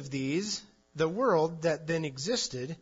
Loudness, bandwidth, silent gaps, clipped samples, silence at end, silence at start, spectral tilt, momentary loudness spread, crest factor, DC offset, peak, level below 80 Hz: -31 LUFS; 7.8 kHz; none; under 0.1%; 0.05 s; 0 s; -4.5 dB/octave; 8 LU; 16 dB; under 0.1%; -16 dBFS; -66 dBFS